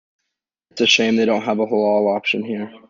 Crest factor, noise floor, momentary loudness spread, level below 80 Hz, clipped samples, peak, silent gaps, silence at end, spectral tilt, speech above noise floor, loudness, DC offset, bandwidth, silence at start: 18 dB; -79 dBFS; 8 LU; -66 dBFS; under 0.1%; -2 dBFS; none; 0.1 s; -3.5 dB/octave; 61 dB; -18 LUFS; under 0.1%; 7.6 kHz; 0.75 s